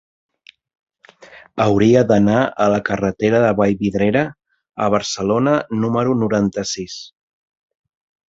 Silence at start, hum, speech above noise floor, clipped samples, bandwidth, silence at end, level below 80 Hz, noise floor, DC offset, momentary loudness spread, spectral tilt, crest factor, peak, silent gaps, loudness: 1.2 s; none; 28 dB; under 0.1%; 7.8 kHz; 1.25 s; -48 dBFS; -44 dBFS; under 0.1%; 12 LU; -6 dB/octave; 18 dB; -2 dBFS; none; -17 LUFS